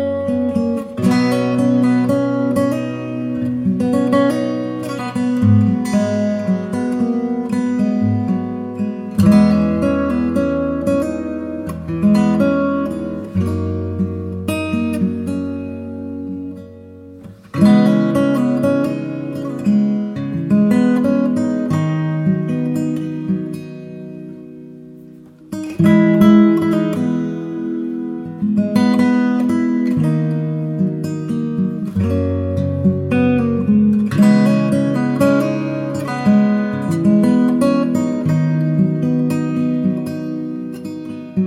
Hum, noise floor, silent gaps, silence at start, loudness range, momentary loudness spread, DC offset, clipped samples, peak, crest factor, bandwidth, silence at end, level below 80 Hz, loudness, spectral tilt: none; -40 dBFS; none; 0 s; 5 LU; 12 LU; under 0.1%; under 0.1%; -2 dBFS; 16 dB; 13.5 kHz; 0 s; -50 dBFS; -17 LUFS; -8 dB/octave